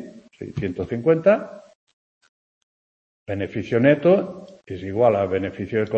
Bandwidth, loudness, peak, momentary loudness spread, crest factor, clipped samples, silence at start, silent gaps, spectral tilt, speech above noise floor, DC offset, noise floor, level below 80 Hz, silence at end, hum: 7.6 kHz; -21 LUFS; -2 dBFS; 19 LU; 20 dB; under 0.1%; 0 s; 1.75-1.87 s, 1.93-2.21 s, 2.29-3.26 s; -8.5 dB/octave; over 69 dB; under 0.1%; under -90 dBFS; -58 dBFS; 0 s; none